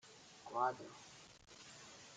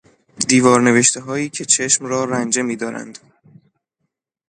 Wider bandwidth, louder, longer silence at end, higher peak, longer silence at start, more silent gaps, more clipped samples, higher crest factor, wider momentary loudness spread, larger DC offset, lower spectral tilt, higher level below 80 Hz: second, 9.6 kHz vs 11 kHz; second, -44 LUFS vs -16 LUFS; second, 0 s vs 1.3 s; second, -24 dBFS vs 0 dBFS; second, 0.05 s vs 0.4 s; neither; neither; about the same, 22 dB vs 18 dB; first, 19 LU vs 13 LU; neither; about the same, -3 dB/octave vs -3 dB/octave; second, -82 dBFS vs -62 dBFS